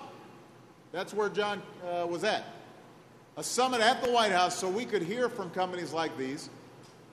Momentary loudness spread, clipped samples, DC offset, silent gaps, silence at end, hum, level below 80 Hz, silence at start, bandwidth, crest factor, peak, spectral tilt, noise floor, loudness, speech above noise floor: 21 LU; under 0.1%; under 0.1%; none; 0 s; none; -74 dBFS; 0 s; 13.5 kHz; 22 dB; -10 dBFS; -3 dB/octave; -55 dBFS; -31 LUFS; 24 dB